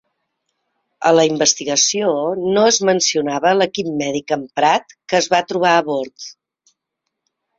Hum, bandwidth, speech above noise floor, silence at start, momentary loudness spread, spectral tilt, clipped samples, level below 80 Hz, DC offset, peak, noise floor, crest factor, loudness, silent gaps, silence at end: none; 7.8 kHz; 62 dB; 1 s; 8 LU; -2.5 dB/octave; under 0.1%; -62 dBFS; under 0.1%; -2 dBFS; -78 dBFS; 16 dB; -16 LUFS; none; 1.25 s